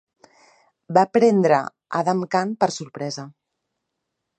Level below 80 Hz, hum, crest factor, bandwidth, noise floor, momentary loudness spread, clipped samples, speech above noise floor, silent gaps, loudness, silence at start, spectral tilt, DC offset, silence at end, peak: -72 dBFS; none; 20 dB; 9 kHz; -79 dBFS; 14 LU; under 0.1%; 60 dB; none; -21 LUFS; 0.9 s; -6 dB/octave; under 0.1%; 1.1 s; -2 dBFS